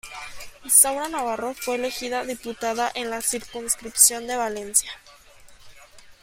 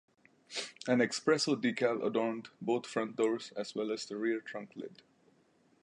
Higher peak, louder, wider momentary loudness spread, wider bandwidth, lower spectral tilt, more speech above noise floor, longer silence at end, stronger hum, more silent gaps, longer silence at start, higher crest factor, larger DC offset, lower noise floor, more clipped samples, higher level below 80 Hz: first, 0 dBFS vs -16 dBFS; first, -21 LUFS vs -34 LUFS; first, 21 LU vs 13 LU; first, 16.5 kHz vs 11 kHz; second, 0 dB/octave vs -4 dB/octave; second, 25 dB vs 35 dB; second, 0.1 s vs 0.9 s; neither; neither; second, 0.05 s vs 0.5 s; first, 26 dB vs 20 dB; neither; second, -48 dBFS vs -69 dBFS; neither; first, -56 dBFS vs -86 dBFS